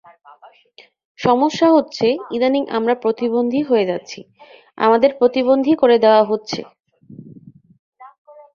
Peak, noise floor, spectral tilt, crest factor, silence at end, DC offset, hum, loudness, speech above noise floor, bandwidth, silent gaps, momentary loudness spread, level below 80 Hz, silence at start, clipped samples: -2 dBFS; -43 dBFS; -5.5 dB/octave; 16 dB; 0.5 s; under 0.1%; none; -16 LUFS; 27 dB; 7.2 kHz; 7.79-7.92 s; 10 LU; -62 dBFS; 1.2 s; under 0.1%